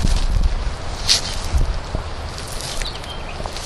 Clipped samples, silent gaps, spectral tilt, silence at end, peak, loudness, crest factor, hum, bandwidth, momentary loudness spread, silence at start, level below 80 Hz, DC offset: under 0.1%; none; -3 dB/octave; 0 s; 0 dBFS; -23 LUFS; 20 dB; none; 13 kHz; 12 LU; 0 s; -22 dBFS; under 0.1%